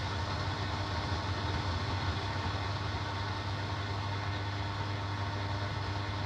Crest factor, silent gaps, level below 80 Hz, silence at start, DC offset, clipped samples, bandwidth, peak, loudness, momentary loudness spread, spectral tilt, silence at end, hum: 12 dB; none; -48 dBFS; 0 s; under 0.1%; under 0.1%; 9.2 kHz; -22 dBFS; -35 LUFS; 2 LU; -5.5 dB/octave; 0 s; none